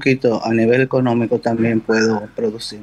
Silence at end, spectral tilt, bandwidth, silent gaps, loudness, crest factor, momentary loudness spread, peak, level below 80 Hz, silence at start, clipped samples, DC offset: 0 s; -6.5 dB/octave; 11.5 kHz; none; -17 LUFS; 14 dB; 7 LU; -4 dBFS; -54 dBFS; 0 s; under 0.1%; under 0.1%